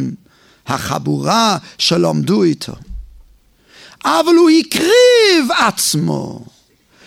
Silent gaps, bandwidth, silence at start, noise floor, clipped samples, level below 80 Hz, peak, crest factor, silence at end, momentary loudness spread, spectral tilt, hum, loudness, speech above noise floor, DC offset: none; 16.5 kHz; 0 s; -51 dBFS; under 0.1%; -42 dBFS; 0 dBFS; 14 dB; 0.65 s; 14 LU; -4 dB/octave; none; -13 LUFS; 37 dB; under 0.1%